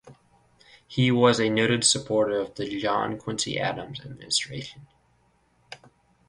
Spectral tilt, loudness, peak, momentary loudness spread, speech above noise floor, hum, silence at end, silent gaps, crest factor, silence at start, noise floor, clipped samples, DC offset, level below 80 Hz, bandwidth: -3.5 dB/octave; -24 LUFS; -6 dBFS; 20 LU; 40 dB; none; 0.55 s; none; 22 dB; 0.05 s; -65 dBFS; under 0.1%; under 0.1%; -60 dBFS; 11.5 kHz